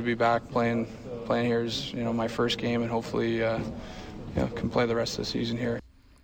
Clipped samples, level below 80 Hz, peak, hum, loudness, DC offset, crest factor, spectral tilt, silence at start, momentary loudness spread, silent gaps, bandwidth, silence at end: under 0.1%; -50 dBFS; -14 dBFS; none; -29 LUFS; under 0.1%; 14 dB; -5.5 dB/octave; 0 s; 10 LU; none; 17 kHz; 0.35 s